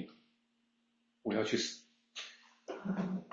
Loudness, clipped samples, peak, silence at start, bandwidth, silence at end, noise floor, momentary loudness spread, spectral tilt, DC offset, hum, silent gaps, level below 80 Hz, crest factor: -38 LUFS; under 0.1%; -20 dBFS; 0 s; 7.8 kHz; 0 s; -78 dBFS; 17 LU; -4 dB/octave; under 0.1%; none; none; -80 dBFS; 22 dB